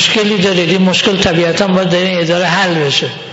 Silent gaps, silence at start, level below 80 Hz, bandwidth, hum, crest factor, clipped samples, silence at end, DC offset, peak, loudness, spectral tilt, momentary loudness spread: none; 0 s; -42 dBFS; 8 kHz; none; 12 dB; under 0.1%; 0 s; under 0.1%; 0 dBFS; -11 LUFS; -4.5 dB/octave; 2 LU